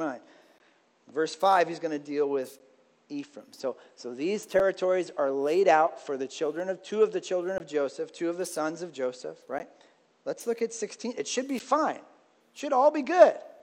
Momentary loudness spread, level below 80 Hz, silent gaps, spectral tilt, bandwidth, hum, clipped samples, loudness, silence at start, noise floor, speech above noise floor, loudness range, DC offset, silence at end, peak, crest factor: 17 LU; -76 dBFS; none; -4 dB/octave; 16.5 kHz; none; under 0.1%; -28 LUFS; 0 s; -65 dBFS; 37 dB; 7 LU; under 0.1%; 0.1 s; -4 dBFS; 24 dB